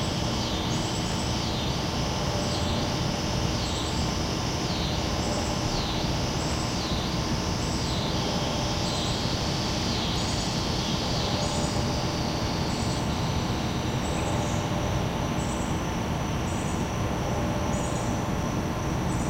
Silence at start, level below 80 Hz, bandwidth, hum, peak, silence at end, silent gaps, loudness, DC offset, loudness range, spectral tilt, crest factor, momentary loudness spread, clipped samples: 0 s; -36 dBFS; 16 kHz; none; -14 dBFS; 0 s; none; -28 LUFS; under 0.1%; 2 LU; -4.5 dB/octave; 14 dB; 2 LU; under 0.1%